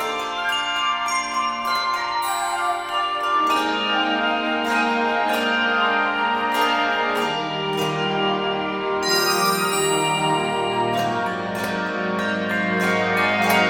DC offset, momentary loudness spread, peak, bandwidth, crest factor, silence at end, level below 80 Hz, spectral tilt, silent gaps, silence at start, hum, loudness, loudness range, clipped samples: under 0.1%; 5 LU; -6 dBFS; 17 kHz; 16 dB; 0 s; -58 dBFS; -3 dB/octave; none; 0 s; none; -21 LUFS; 2 LU; under 0.1%